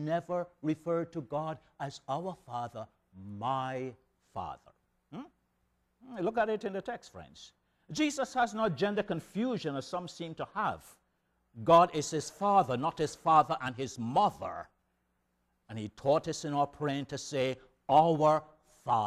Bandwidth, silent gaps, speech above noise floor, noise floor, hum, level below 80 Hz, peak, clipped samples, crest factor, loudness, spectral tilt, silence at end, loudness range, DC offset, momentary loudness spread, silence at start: 14 kHz; none; 46 dB; -78 dBFS; none; -66 dBFS; -12 dBFS; under 0.1%; 20 dB; -32 LUFS; -5.5 dB/octave; 0 s; 10 LU; under 0.1%; 20 LU; 0 s